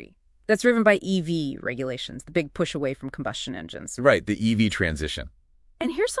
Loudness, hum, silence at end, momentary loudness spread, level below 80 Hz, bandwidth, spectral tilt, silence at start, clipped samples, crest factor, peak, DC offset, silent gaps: -25 LUFS; none; 0 s; 13 LU; -48 dBFS; 12 kHz; -5 dB/octave; 0 s; under 0.1%; 22 dB; -2 dBFS; under 0.1%; none